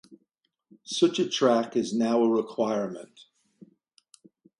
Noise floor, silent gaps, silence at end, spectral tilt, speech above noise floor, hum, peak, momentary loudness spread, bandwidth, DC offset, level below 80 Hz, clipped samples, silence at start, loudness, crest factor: -76 dBFS; none; 1.55 s; -4.5 dB/octave; 50 dB; none; -8 dBFS; 10 LU; 11.5 kHz; under 0.1%; -76 dBFS; under 0.1%; 0.1 s; -26 LUFS; 20 dB